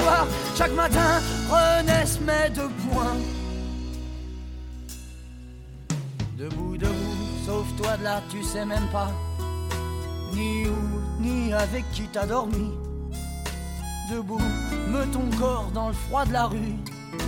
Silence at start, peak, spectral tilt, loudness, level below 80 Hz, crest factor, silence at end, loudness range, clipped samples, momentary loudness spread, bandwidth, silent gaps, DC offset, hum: 0 s; -8 dBFS; -5 dB/octave; -26 LUFS; -34 dBFS; 18 dB; 0 s; 9 LU; under 0.1%; 14 LU; 17 kHz; none; under 0.1%; none